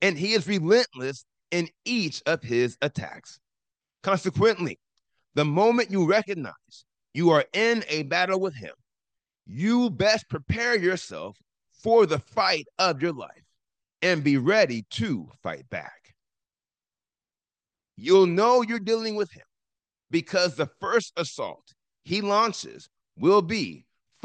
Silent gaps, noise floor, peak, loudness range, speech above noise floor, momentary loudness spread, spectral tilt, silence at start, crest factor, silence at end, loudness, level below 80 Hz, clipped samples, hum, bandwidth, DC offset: none; under -90 dBFS; -8 dBFS; 4 LU; over 66 dB; 15 LU; -5 dB/octave; 0 s; 18 dB; 0.5 s; -24 LUFS; -64 dBFS; under 0.1%; none; 9.2 kHz; under 0.1%